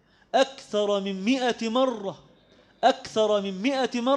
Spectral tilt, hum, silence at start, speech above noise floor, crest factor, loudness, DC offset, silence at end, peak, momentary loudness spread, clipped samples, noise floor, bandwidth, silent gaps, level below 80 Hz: -4.5 dB/octave; none; 0.35 s; 33 dB; 18 dB; -25 LUFS; under 0.1%; 0 s; -6 dBFS; 3 LU; under 0.1%; -58 dBFS; 10 kHz; none; -68 dBFS